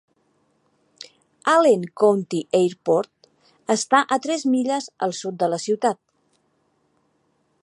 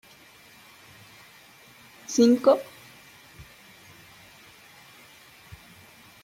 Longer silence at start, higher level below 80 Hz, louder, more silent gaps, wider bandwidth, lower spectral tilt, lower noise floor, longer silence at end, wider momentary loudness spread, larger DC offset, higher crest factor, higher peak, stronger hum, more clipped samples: second, 1.45 s vs 2.1 s; second, -76 dBFS vs -66 dBFS; about the same, -21 LUFS vs -22 LUFS; neither; second, 11.5 kHz vs 16.5 kHz; about the same, -4.5 dB/octave vs -4.5 dB/octave; first, -67 dBFS vs -53 dBFS; second, 1.7 s vs 2.8 s; second, 18 LU vs 29 LU; neither; about the same, 20 dB vs 24 dB; first, -2 dBFS vs -6 dBFS; neither; neither